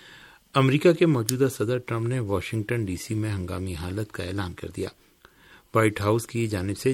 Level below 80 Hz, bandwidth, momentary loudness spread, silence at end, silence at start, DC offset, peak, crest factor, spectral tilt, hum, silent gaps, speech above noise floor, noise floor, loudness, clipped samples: -52 dBFS; 16.5 kHz; 12 LU; 0 s; 0.05 s; under 0.1%; -2 dBFS; 24 dB; -6 dB/octave; none; none; 29 dB; -54 dBFS; -26 LUFS; under 0.1%